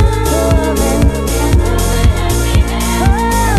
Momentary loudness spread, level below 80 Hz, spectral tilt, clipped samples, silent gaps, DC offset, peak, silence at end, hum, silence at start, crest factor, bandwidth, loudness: 2 LU; -14 dBFS; -5.5 dB/octave; under 0.1%; none; under 0.1%; 0 dBFS; 0 s; none; 0 s; 12 dB; 14.5 kHz; -13 LUFS